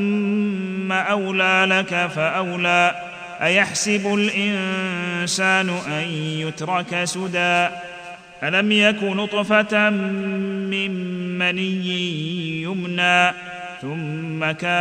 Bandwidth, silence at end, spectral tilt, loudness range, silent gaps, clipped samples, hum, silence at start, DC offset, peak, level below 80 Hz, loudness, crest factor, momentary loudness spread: 14 kHz; 0 s; -4 dB/octave; 3 LU; none; under 0.1%; none; 0 s; under 0.1%; -4 dBFS; -64 dBFS; -20 LUFS; 18 dB; 11 LU